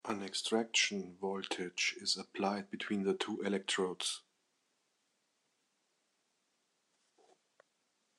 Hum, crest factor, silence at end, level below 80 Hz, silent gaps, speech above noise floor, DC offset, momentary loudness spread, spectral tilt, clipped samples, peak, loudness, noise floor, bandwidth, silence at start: none; 22 dB; 4 s; -90 dBFS; none; 44 dB; under 0.1%; 9 LU; -2.5 dB/octave; under 0.1%; -18 dBFS; -36 LUFS; -81 dBFS; 12 kHz; 0.05 s